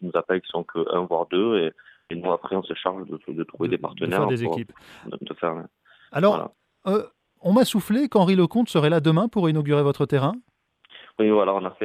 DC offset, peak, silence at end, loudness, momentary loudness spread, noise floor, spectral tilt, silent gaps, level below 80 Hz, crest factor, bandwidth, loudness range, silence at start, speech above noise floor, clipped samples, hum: under 0.1%; -6 dBFS; 0 s; -23 LUFS; 15 LU; -52 dBFS; -7 dB/octave; none; -66 dBFS; 18 dB; 14.5 kHz; 7 LU; 0 s; 29 dB; under 0.1%; none